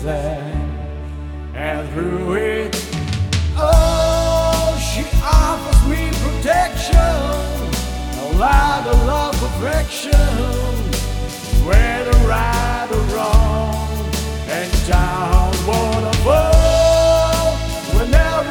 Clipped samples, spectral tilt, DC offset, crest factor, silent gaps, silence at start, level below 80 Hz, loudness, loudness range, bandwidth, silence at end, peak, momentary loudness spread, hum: under 0.1%; -5 dB/octave; under 0.1%; 16 dB; none; 0 s; -18 dBFS; -17 LUFS; 3 LU; 18.5 kHz; 0 s; 0 dBFS; 9 LU; none